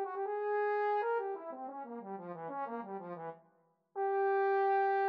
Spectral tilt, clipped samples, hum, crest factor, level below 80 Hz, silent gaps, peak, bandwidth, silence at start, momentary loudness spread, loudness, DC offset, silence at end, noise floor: -4 dB/octave; under 0.1%; none; 12 dB; under -90 dBFS; none; -24 dBFS; 5.2 kHz; 0 s; 14 LU; -36 LUFS; under 0.1%; 0 s; -72 dBFS